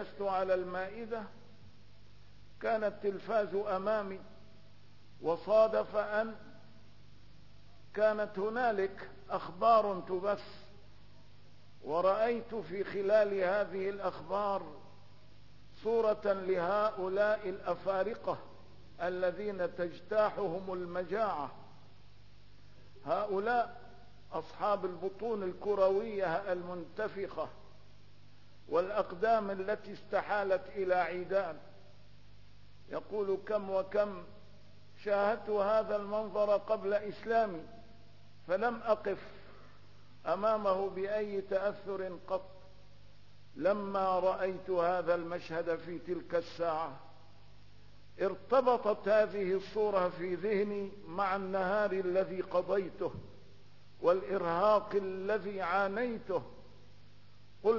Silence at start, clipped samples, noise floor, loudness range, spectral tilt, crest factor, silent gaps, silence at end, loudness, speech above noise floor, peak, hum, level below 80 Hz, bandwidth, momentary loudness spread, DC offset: 0 s; under 0.1%; -61 dBFS; 4 LU; -4 dB/octave; 20 dB; none; 0 s; -34 LUFS; 28 dB; -16 dBFS; 50 Hz at -60 dBFS; -66 dBFS; 6 kHz; 11 LU; 0.3%